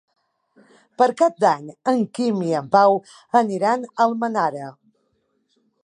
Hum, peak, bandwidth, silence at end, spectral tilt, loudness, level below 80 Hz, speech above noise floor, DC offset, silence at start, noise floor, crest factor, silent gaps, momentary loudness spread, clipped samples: none; -2 dBFS; 11 kHz; 1.1 s; -6 dB/octave; -20 LUFS; -76 dBFS; 49 dB; under 0.1%; 1 s; -69 dBFS; 20 dB; none; 8 LU; under 0.1%